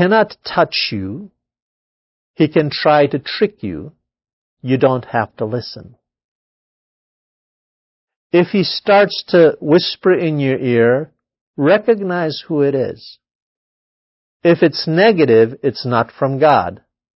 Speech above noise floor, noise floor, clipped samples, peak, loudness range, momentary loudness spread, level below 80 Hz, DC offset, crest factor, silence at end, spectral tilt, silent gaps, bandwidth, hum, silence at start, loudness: over 75 dB; under -90 dBFS; under 0.1%; 0 dBFS; 8 LU; 13 LU; -54 dBFS; under 0.1%; 16 dB; 0.4 s; -9.5 dB/octave; 1.62-2.34 s, 4.33-4.57 s, 6.24-8.08 s, 8.16-8.30 s, 11.41-11.54 s, 13.35-14.40 s; 5.8 kHz; none; 0 s; -15 LUFS